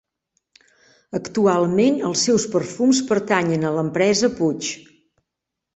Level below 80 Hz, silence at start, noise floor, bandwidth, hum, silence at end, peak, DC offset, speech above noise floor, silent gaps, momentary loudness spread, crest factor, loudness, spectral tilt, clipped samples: -60 dBFS; 1.15 s; -83 dBFS; 8.4 kHz; none; 0.95 s; -2 dBFS; under 0.1%; 64 dB; none; 10 LU; 18 dB; -20 LUFS; -4.5 dB/octave; under 0.1%